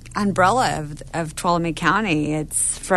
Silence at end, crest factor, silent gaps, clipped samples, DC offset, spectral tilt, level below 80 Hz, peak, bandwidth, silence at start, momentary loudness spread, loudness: 0 s; 18 dB; none; under 0.1%; under 0.1%; -4 dB/octave; -42 dBFS; -4 dBFS; 12.5 kHz; 0 s; 10 LU; -20 LUFS